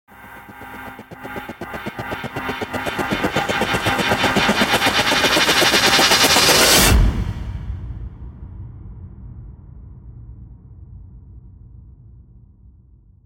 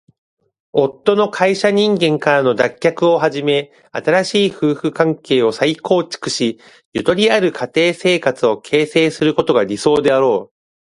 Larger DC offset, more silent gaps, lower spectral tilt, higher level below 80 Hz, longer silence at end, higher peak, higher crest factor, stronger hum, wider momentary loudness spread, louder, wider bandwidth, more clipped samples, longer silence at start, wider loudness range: neither; second, none vs 6.85-6.92 s; second, -2.5 dB/octave vs -5 dB/octave; first, -30 dBFS vs -58 dBFS; first, 1.05 s vs 0.55 s; about the same, -2 dBFS vs 0 dBFS; about the same, 18 dB vs 16 dB; neither; first, 26 LU vs 6 LU; about the same, -15 LUFS vs -16 LUFS; first, 17 kHz vs 11.5 kHz; neither; second, 0.2 s vs 0.75 s; first, 16 LU vs 2 LU